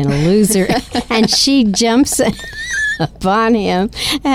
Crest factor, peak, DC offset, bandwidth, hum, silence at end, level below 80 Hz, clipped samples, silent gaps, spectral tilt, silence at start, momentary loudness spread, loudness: 10 dB; -2 dBFS; under 0.1%; 16.5 kHz; none; 0 s; -36 dBFS; under 0.1%; none; -4 dB/octave; 0 s; 7 LU; -13 LUFS